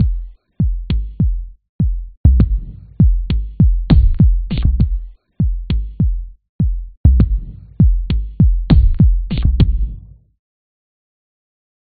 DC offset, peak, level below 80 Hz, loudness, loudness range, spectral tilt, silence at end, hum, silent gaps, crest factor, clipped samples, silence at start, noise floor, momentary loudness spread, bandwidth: 0.2%; 0 dBFS; -16 dBFS; -17 LUFS; 3 LU; -9.5 dB/octave; 2 s; none; 1.69-1.79 s, 2.17-2.24 s, 6.49-6.59 s, 6.97-7.04 s; 14 dB; under 0.1%; 0 s; -33 dBFS; 11 LU; 4.7 kHz